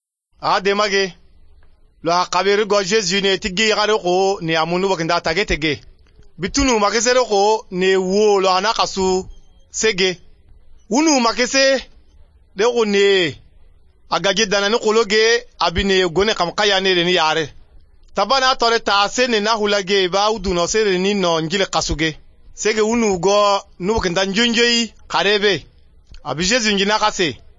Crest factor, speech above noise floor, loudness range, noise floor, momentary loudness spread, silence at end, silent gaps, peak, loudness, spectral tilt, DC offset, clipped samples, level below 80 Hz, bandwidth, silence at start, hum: 16 dB; 31 dB; 2 LU; -47 dBFS; 7 LU; 0.2 s; none; -2 dBFS; -17 LUFS; -3 dB/octave; under 0.1%; under 0.1%; -40 dBFS; 7.8 kHz; 0.4 s; none